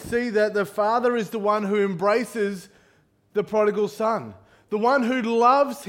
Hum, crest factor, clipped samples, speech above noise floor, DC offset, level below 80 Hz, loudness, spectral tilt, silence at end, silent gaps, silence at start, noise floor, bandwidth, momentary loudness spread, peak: none; 18 dB; under 0.1%; 39 dB; under 0.1%; -62 dBFS; -23 LUFS; -5.5 dB/octave; 0 s; none; 0 s; -61 dBFS; 16.5 kHz; 10 LU; -6 dBFS